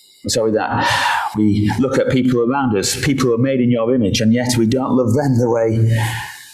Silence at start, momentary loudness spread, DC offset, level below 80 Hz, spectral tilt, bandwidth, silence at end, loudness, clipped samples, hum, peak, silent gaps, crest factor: 0.25 s; 2 LU; under 0.1%; -42 dBFS; -5.5 dB/octave; 15.5 kHz; 0 s; -16 LUFS; under 0.1%; none; -4 dBFS; none; 12 dB